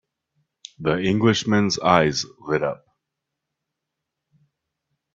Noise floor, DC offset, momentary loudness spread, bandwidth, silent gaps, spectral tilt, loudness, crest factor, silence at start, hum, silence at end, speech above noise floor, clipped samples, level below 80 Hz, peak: -82 dBFS; under 0.1%; 10 LU; 7.8 kHz; none; -5 dB/octave; -21 LUFS; 24 dB; 0.8 s; none; 2.4 s; 62 dB; under 0.1%; -56 dBFS; 0 dBFS